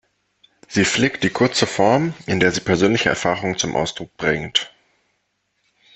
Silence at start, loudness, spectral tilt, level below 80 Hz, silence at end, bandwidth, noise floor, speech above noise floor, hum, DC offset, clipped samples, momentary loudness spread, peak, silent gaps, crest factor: 0.7 s; -19 LUFS; -4 dB/octave; -50 dBFS; 1.3 s; 8.6 kHz; -70 dBFS; 51 dB; none; under 0.1%; under 0.1%; 7 LU; -2 dBFS; none; 18 dB